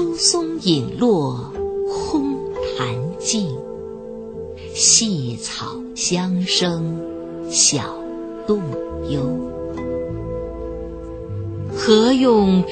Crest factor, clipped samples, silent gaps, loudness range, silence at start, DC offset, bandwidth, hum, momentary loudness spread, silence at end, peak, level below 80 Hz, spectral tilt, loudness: 20 dB; under 0.1%; none; 7 LU; 0 s; under 0.1%; 9.2 kHz; none; 16 LU; 0 s; 0 dBFS; -42 dBFS; -3.5 dB/octave; -19 LUFS